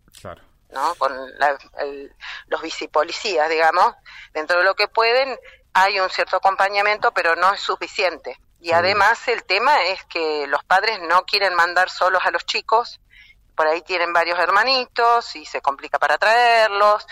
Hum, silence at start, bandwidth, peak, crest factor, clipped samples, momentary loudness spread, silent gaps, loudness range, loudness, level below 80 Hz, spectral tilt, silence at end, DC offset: none; 0.25 s; 16 kHz; -6 dBFS; 14 dB; under 0.1%; 13 LU; none; 3 LU; -18 LUFS; -58 dBFS; -2 dB/octave; 0.1 s; under 0.1%